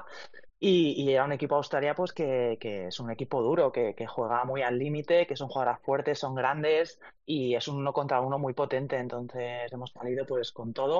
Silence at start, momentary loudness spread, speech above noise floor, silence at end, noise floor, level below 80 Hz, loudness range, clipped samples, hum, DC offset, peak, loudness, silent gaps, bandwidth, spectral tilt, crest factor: 0 s; 10 LU; 20 dB; 0 s; -49 dBFS; -70 dBFS; 3 LU; under 0.1%; none; 0.2%; -12 dBFS; -30 LUFS; none; 7.4 kHz; -4.5 dB/octave; 16 dB